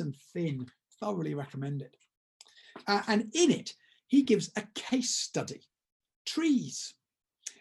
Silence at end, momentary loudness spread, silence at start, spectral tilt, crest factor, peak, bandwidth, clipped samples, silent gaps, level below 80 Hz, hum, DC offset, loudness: 0.1 s; 18 LU; 0 s; -4 dB/octave; 20 dB; -12 dBFS; 12.5 kHz; under 0.1%; 2.17-2.40 s, 5.92-6.00 s, 6.16-6.25 s; -78 dBFS; none; under 0.1%; -31 LUFS